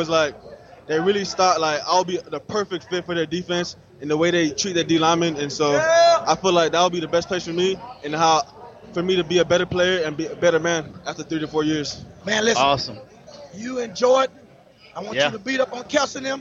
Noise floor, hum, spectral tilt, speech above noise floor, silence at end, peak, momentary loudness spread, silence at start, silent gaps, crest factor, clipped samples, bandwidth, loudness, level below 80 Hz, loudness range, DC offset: -49 dBFS; none; -4 dB/octave; 28 dB; 0 s; -4 dBFS; 12 LU; 0 s; none; 16 dB; under 0.1%; 7.8 kHz; -21 LUFS; -56 dBFS; 4 LU; under 0.1%